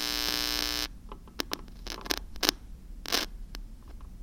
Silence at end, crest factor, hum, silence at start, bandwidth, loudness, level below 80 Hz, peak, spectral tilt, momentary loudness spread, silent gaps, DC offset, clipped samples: 0 s; 34 dB; none; 0 s; 17 kHz; -31 LUFS; -44 dBFS; 0 dBFS; -1.5 dB/octave; 22 LU; none; under 0.1%; under 0.1%